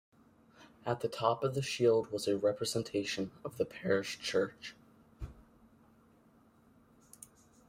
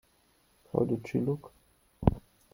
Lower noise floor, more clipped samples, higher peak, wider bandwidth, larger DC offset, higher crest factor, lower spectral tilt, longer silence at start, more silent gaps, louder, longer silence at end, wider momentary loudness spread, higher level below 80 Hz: about the same, -65 dBFS vs -68 dBFS; neither; second, -16 dBFS vs -8 dBFS; about the same, 16 kHz vs 16.5 kHz; neither; about the same, 22 dB vs 26 dB; second, -4.5 dB/octave vs -9.5 dB/octave; second, 0.6 s vs 0.75 s; neither; about the same, -34 LUFS vs -32 LUFS; first, 2.3 s vs 0.35 s; first, 20 LU vs 7 LU; second, -62 dBFS vs -46 dBFS